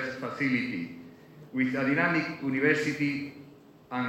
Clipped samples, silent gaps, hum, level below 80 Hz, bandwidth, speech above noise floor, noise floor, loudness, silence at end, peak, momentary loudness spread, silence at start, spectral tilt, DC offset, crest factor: under 0.1%; none; none; -70 dBFS; 12 kHz; 24 dB; -53 dBFS; -28 LUFS; 0 s; -12 dBFS; 12 LU; 0 s; -6 dB/octave; under 0.1%; 18 dB